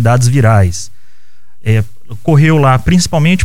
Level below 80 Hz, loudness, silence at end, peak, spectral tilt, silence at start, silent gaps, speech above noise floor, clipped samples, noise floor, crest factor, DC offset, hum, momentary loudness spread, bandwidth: -32 dBFS; -11 LUFS; 0 s; 0 dBFS; -6 dB/octave; 0 s; none; 45 dB; under 0.1%; -55 dBFS; 12 dB; 8%; none; 15 LU; 15.5 kHz